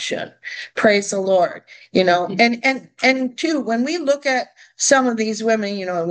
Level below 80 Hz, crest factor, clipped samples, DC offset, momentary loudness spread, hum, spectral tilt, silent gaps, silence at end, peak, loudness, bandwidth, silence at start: -68 dBFS; 18 dB; under 0.1%; under 0.1%; 10 LU; none; -3 dB/octave; none; 0 s; 0 dBFS; -18 LUFS; 10 kHz; 0 s